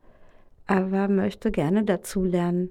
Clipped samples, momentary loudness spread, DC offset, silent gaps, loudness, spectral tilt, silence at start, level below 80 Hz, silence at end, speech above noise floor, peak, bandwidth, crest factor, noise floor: under 0.1%; 3 LU; under 0.1%; none; -24 LUFS; -7 dB/octave; 0.7 s; -46 dBFS; 0 s; 27 dB; -8 dBFS; 14.5 kHz; 16 dB; -51 dBFS